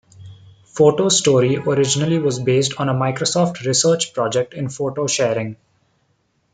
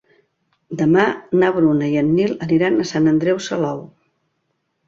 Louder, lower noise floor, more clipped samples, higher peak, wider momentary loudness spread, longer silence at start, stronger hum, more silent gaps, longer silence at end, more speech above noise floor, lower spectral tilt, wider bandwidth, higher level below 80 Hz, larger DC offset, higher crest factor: about the same, -18 LUFS vs -17 LUFS; second, -65 dBFS vs -71 dBFS; neither; about the same, -2 dBFS vs -2 dBFS; about the same, 9 LU vs 7 LU; second, 0.2 s vs 0.7 s; neither; neither; about the same, 1 s vs 1 s; second, 47 dB vs 54 dB; second, -4 dB/octave vs -6.5 dB/octave; first, 9.6 kHz vs 7.6 kHz; about the same, -58 dBFS vs -56 dBFS; neither; about the same, 16 dB vs 18 dB